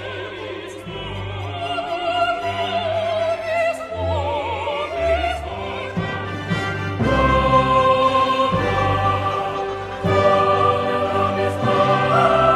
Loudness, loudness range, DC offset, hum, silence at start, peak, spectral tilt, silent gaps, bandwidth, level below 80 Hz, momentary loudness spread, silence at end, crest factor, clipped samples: -20 LUFS; 5 LU; under 0.1%; none; 0 s; -2 dBFS; -6 dB/octave; none; 13 kHz; -38 dBFS; 12 LU; 0 s; 18 dB; under 0.1%